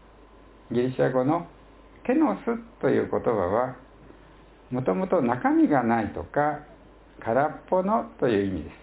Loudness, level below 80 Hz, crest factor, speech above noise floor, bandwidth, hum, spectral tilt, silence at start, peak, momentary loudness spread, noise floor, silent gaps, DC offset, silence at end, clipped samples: -25 LUFS; -52 dBFS; 18 dB; 27 dB; 4 kHz; none; -11.5 dB/octave; 0.7 s; -8 dBFS; 9 LU; -51 dBFS; none; under 0.1%; 0.05 s; under 0.1%